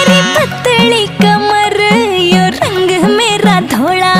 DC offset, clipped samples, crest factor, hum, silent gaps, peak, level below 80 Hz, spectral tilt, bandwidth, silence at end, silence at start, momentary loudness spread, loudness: under 0.1%; 0.3%; 10 dB; none; none; 0 dBFS; -44 dBFS; -4.5 dB/octave; 16 kHz; 0 s; 0 s; 3 LU; -9 LUFS